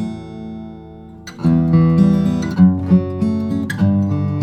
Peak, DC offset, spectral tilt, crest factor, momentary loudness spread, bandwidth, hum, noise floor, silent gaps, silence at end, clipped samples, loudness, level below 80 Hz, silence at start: -2 dBFS; under 0.1%; -9 dB/octave; 14 dB; 20 LU; 8.6 kHz; none; -36 dBFS; none; 0 s; under 0.1%; -16 LUFS; -44 dBFS; 0 s